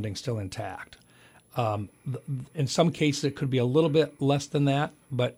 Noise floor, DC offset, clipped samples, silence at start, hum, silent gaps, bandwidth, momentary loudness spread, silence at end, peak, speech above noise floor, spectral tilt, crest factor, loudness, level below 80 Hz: -57 dBFS; under 0.1%; under 0.1%; 0 s; none; none; 14 kHz; 13 LU; 0.05 s; -10 dBFS; 30 dB; -6 dB/octave; 18 dB; -27 LUFS; -62 dBFS